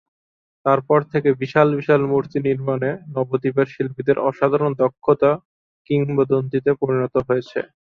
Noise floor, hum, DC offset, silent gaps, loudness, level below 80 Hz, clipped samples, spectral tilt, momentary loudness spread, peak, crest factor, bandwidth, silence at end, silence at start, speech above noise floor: under -90 dBFS; none; under 0.1%; 5.45-5.85 s; -20 LUFS; -58 dBFS; under 0.1%; -9.5 dB/octave; 6 LU; -2 dBFS; 18 dB; 6.2 kHz; 0.3 s; 0.65 s; over 71 dB